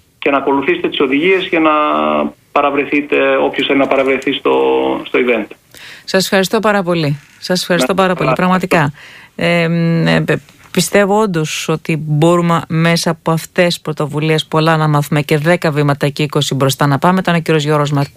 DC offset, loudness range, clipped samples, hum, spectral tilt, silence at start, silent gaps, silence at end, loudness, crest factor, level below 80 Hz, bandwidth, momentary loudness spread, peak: under 0.1%; 1 LU; under 0.1%; none; -5.5 dB/octave; 0.2 s; none; 0.05 s; -13 LUFS; 14 dB; -50 dBFS; 15.5 kHz; 6 LU; 0 dBFS